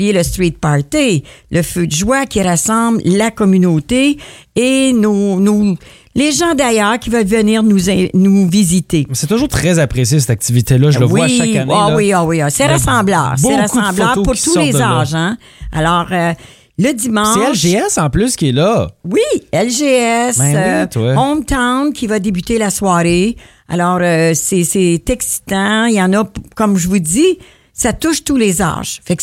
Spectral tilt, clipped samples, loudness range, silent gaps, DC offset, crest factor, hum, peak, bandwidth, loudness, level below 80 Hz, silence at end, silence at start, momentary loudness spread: -5 dB/octave; under 0.1%; 2 LU; none; under 0.1%; 12 dB; none; 0 dBFS; 16.5 kHz; -13 LUFS; -34 dBFS; 0 s; 0 s; 6 LU